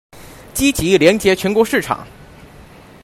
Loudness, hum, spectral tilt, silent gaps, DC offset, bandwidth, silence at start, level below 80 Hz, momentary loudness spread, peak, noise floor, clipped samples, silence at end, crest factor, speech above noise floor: -15 LUFS; none; -4 dB/octave; none; under 0.1%; 16 kHz; 0.15 s; -40 dBFS; 12 LU; 0 dBFS; -41 dBFS; under 0.1%; 0.4 s; 18 dB; 27 dB